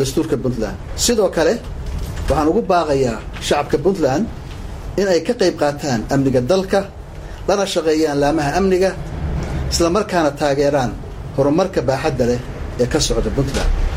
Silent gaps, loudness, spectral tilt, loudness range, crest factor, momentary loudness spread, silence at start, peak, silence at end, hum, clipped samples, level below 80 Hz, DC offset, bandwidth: none; -18 LUFS; -5 dB/octave; 1 LU; 16 dB; 10 LU; 0 s; -2 dBFS; 0 s; none; under 0.1%; -28 dBFS; under 0.1%; 16 kHz